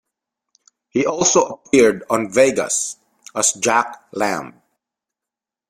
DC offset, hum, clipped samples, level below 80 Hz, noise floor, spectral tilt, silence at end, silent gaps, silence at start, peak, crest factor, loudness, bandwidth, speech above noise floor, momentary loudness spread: under 0.1%; none; under 0.1%; -58 dBFS; -87 dBFS; -2.5 dB/octave; 1.2 s; none; 0.95 s; 0 dBFS; 18 dB; -18 LUFS; 16 kHz; 70 dB; 12 LU